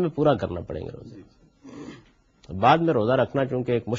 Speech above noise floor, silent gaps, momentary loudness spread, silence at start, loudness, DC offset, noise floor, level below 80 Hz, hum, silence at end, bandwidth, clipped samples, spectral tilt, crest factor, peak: 33 dB; none; 22 LU; 0 s; -23 LUFS; under 0.1%; -56 dBFS; -52 dBFS; none; 0 s; 7.6 kHz; under 0.1%; -8 dB/octave; 20 dB; -4 dBFS